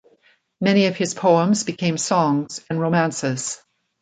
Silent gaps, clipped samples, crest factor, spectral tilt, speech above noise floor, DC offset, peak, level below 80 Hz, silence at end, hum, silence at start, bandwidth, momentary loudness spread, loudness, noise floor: none; under 0.1%; 18 dB; -5 dB/octave; 40 dB; under 0.1%; -4 dBFS; -64 dBFS; 0.45 s; none; 0.6 s; 9.4 kHz; 9 LU; -20 LUFS; -59 dBFS